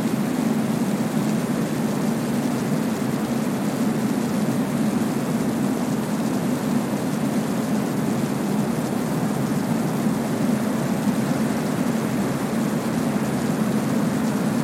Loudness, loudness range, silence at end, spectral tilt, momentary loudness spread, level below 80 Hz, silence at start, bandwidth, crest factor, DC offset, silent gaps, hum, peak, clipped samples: -23 LUFS; 1 LU; 0 s; -6 dB/octave; 1 LU; -54 dBFS; 0 s; 16.5 kHz; 14 dB; under 0.1%; none; none; -10 dBFS; under 0.1%